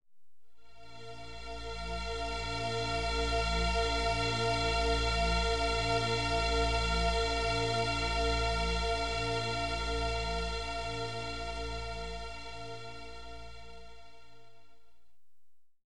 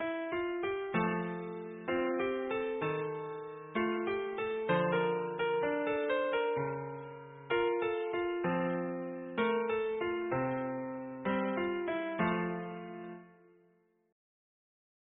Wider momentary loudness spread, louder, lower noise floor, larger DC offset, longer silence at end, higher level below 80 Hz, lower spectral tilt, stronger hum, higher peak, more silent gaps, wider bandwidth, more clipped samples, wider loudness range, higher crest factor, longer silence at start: first, 16 LU vs 10 LU; first, -32 LUFS vs -35 LUFS; first, -78 dBFS vs -70 dBFS; first, 0.5% vs under 0.1%; second, 0 s vs 1.85 s; first, -40 dBFS vs -68 dBFS; first, -4 dB/octave vs -2.5 dB/octave; neither; about the same, -18 dBFS vs -18 dBFS; neither; first, 11.5 kHz vs 3.9 kHz; neither; first, 13 LU vs 4 LU; about the same, 16 dB vs 16 dB; about the same, 0 s vs 0 s